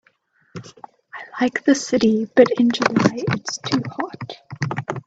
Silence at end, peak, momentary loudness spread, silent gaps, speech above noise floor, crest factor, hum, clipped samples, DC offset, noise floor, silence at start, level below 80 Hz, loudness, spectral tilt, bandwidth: 0.05 s; 0 dBFS; 22 LU; none; 42 dB; 20 dB; none; under 0.1%; under 0.1%; -61 dBFS; 0.55 s; -60 dBFS; -20 LUFS; -5 dB/octave; 8 kHz